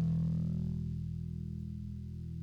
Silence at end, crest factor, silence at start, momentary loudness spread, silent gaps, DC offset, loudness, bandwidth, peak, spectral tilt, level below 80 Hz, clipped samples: 0 s; 10 dB; 0 s; 10 LU; none; under 0.1%; -38 LUFS; 5.2 kHz; -26 dBFS; -10.5 dB/octave; -48 dBFS; under 0.1%